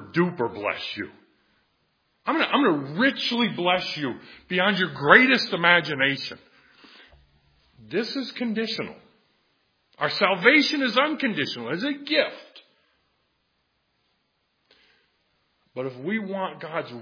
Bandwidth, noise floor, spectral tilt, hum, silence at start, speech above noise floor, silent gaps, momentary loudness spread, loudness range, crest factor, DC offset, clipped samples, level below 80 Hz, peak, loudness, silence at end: 5.4 kHz; -72 dBFS; -5 dB/octave; none; 0 s; 49 dB; none; 15 LU; 12 LU; 26 dB; under 0.1%; under 0.1%; -70 dBFS; 0 dBFS; -23 LUFS; 0 s